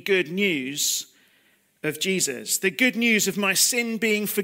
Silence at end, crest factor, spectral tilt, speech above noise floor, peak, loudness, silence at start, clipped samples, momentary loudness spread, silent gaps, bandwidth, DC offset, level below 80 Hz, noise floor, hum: 0 s; 18 dB; -2 dB/octave; 39 dB; -6 dBFS; -22 LUFS; 0.05 s; under 0.1%; 8 LU; none; 16.5 kHz; under 0.1%; -76 dBFS; -63 dBFS; none